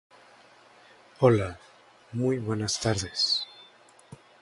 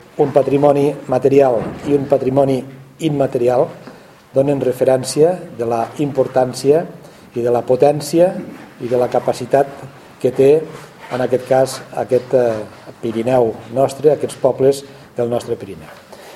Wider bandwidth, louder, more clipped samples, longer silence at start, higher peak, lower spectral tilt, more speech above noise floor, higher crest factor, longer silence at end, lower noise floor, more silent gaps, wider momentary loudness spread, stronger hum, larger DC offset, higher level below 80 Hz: second, 11.5 kHz vs 15 kHz; second, -27 LUFS vs -16 LUFS; neither; first, 1.2 s vs 0.15 s; second, -6 dBFS vs 0 dBFS; second, -4.5 dB/octave vs -6.5 dB/octave; first, 30 dB vs 24 dB; first, 24 dB vs 16 dB; first, 0.25 s vs 0 s; first, -56 dBFS vs -39 dBFS; neither; about the same, 15 LU vs 13 LU; neither; neither; about the same, -54 dBFS vs -54 dBFS